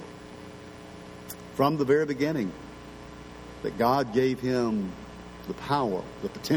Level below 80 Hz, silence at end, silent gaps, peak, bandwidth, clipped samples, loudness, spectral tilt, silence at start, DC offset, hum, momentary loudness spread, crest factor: -54 dBFS; 0 s; none; -10 dBFS; 19 kHz; under 0.1%; -28 LUFS; -6.5 dB/octave; 0 s; under 0.1%; none; 20 LU; 20 dB